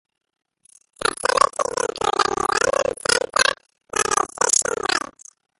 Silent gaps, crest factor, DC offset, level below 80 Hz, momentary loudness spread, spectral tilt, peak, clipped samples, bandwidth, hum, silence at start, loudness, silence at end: none; 22 dB; under 0.1%; -52 dBFS; 7 LU; -0.5 dB/octave; -2 dBFS; under 0.1%; 12 kHz; none; 1 s; -20 LUFS; 0.6 s